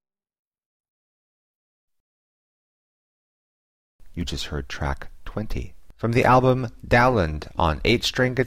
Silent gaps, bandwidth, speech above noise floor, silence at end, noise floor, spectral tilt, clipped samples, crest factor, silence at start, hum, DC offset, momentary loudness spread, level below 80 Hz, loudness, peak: none; 15 kHz; over 68 dB; 0 s; under -90 dBFS; -5.5 dB/octave; under 0.1%; 20 dB; 4.05 s; none; under 0.1%; 17 LU; -38 dBFS; -22 LUFS; -6 dBFS